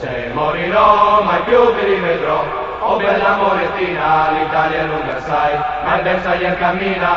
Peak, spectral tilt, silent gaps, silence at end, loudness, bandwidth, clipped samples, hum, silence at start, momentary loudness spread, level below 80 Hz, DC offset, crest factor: 0 dBFS; -3 dB/octave; none; 0 s; -15 LUFS; 7.2 kHz; under 0.1%; none; 0 s; 7 LU; -40 dBFS; 0.1%; 14 dB